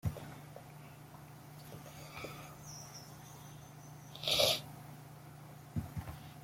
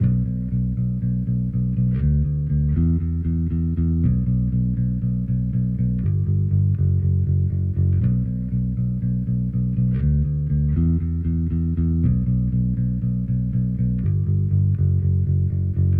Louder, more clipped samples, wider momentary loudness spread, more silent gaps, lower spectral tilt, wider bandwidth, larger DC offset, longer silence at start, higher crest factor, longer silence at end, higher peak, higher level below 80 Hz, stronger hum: second, -38 LUFS vs -22 LUFS; neither; first, 22 LU vs 3 LU; neither; second, -3 dB/octave vs -13.5 dB/octave; first, 16.5 kHz vs 2.5 kHz; neither; about the same, 0.05 s vs 0 s; first, 28 dB vs 10 dB; about the same, 0 s vs 0 s; second, -14 dBFS vs -10 dBFS; second, -62 dBFS vs -30 dBFS; neither